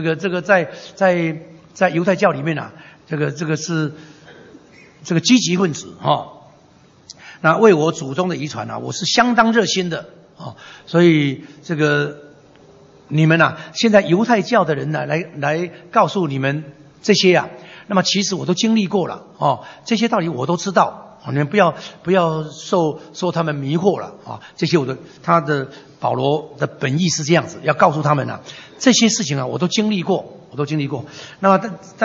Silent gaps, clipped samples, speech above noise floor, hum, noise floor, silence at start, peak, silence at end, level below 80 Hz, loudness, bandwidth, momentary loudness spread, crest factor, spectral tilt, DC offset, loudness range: none; under 0.1%; 32 dB; none; -50 dBFS; 0 s; 0 dBFS; 0 s; -62 dBFS; -18 LUFS; 8 kHz; 14 LU; 18 dB; -5 dB/octave; under 0.1%; 3 LU